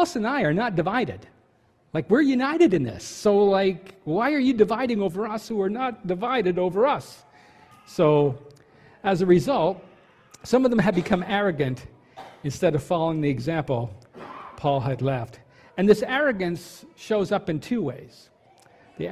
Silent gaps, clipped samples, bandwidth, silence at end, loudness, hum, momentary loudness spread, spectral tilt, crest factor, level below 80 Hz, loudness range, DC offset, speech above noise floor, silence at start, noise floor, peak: none; under 0.1%; 14 kHz; 0 s; -23 LUFS; none; 16 LU; -6.5 dB/octave; 18 dB; -56 dBFS; 4 LU; under 0.1%; 39 dB; 0 s; -62 dBFS; -6 dBFS